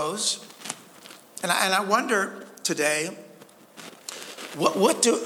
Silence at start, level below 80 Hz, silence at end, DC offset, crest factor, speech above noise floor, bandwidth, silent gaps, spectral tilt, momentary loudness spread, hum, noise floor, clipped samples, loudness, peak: 0 s; -82 dBFS; 0 s; under 0.1%; 22 dB; 27 dB; over 20 kHz; none; -2 dB/octave; 21 LU; none; -50 dBFS; under 0.1%; -24 LUFS; -4 dBFS